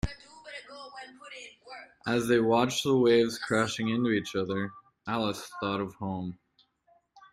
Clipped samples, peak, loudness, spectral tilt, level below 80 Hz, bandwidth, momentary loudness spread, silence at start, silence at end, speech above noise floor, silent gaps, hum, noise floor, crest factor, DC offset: under 0.1%; -10 dBFS; -28 LUFS; -5 dB/octave; -54 dBFS; 15.5 kHz; 21 LU; 0.05 s; 1 s; 39 dB; none; none; -67 dBFS; 20 dB; under 0.1%